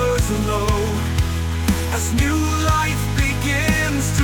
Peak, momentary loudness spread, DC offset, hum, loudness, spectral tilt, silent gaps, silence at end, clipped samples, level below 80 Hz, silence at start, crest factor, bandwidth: -6 dBFS; 3 LU; under 0.1%; none; -19 LUFS; -5 dB/octave; none; 0 s; under 0.1%; -26 dBFS; 0 s; 12 dB; 19.5 kHz